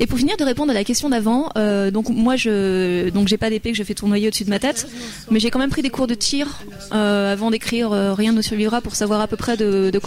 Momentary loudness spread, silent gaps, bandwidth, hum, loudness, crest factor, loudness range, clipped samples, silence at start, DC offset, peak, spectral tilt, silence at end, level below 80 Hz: 4 LU; none; 16 kHz; none; -19 LUFS; 12 dB; 2 LU; under 0.1%; 0 s; under 0.1%; -6 dBFS; -4.5 dB/octave; 0 s; -40 dBFS